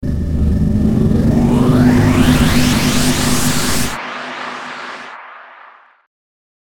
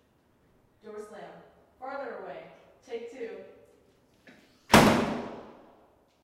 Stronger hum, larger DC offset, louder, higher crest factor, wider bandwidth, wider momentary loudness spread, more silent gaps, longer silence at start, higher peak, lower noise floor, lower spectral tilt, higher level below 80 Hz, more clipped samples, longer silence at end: neither; neither; first, -14 LUFS vs -26 LUFS; second, 14 dB vs 28 dB; first, 19 kHz vs 16 kHz; second, 16 LU vs 26 LU; neither; second, 0 s vs 0.85 s; first, 0 dBFS vs -4 dBFS; second, -43 dBFS vs -66 dBFS; about the same, -5 dB/octave vs -4.5 dB/octave; first, -24 dBFS vs -52 dBFS; neither; second, 0.6 s vs 0.75 s